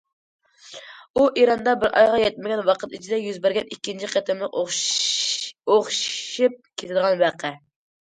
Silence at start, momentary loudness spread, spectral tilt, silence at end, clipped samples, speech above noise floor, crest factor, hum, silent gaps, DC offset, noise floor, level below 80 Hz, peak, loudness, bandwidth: 0.65 s; 14 LU; -2 dB/octave; 0.45 s; under 0.1%; 22 dB; 18 dB; none; 1.10-1.14 s; under 0.1%; -43 dBFS; -62 dBFS; -4 dBFS; -22 LUFS; 9.6 kHz